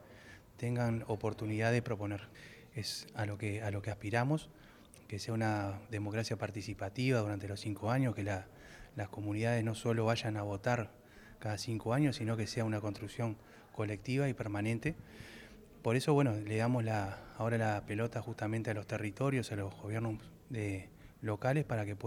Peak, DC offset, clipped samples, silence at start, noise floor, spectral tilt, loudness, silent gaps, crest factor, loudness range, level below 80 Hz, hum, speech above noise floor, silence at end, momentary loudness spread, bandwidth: -18 dBFS; under 0.1%; under 0.1%; 0 s; -56 dBFS; -6.5 dB/octave; -37 LUFS; none; 18 dB; 3 LU; -64 dBFS; none; 20 dB; 0 s; 13 LU; 15.5 kHz